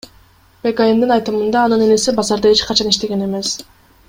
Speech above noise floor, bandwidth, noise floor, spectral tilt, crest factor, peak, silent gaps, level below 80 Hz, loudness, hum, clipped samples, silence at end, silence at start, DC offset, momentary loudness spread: 34 dB; 16.5 kHz; -49 dBFS; -3.5 dB/octave; 16 dB; 0 dBFS; none; -46 dBFS; -15 LUFS; none; under 0.1%; 0.45 s; 0.65 s; under 0.1%; 8 LU